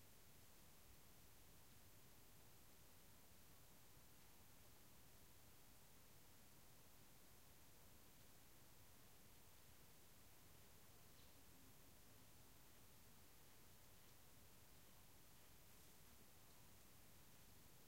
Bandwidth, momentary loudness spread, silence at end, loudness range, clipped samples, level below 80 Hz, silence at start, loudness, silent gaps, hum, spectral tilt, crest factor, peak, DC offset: 16 kHz; 1 LU; 0 s; 0 LU; under 0.1%; -78 dBFS; 0 s; -68 LUFS; none; none; -3 dB/octave; 14 dB; -54 dBFS; under 0.1%